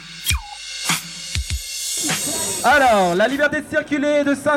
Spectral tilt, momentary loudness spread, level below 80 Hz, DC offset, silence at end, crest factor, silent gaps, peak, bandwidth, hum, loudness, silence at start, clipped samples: -3 dB/octave; 10 LU; -36 dBFS; under 0.1%; 0 s; 16 dB; none; -4 dBFS; 19.5 kHz; none; -19 LUFS; 0 s; under 0.1%